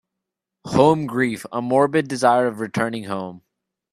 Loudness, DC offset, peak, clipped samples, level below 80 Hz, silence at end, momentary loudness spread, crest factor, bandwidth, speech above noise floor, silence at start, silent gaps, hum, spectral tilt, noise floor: -20 LUFS; under 0.1%; -2 dBFS; under 0.1%; -58 dBFS; 0.55 s; 11 LU; 20 dB; 14 kHz; 64 dB; 0.65 s; none; none; -6 dB/octave; -83 dBFS